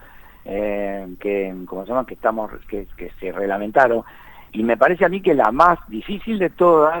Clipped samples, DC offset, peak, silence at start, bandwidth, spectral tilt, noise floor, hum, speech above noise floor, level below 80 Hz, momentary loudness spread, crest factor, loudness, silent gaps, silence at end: under 0.1%; under 0.1%; 0 dBFS; 0.15 s; 19 kHz; -7.5 dB/octave; -40 dBFS; none; 21 dB; -44 dBFS; 16 LU; 20 dB; -19 LUFS; none; 0 s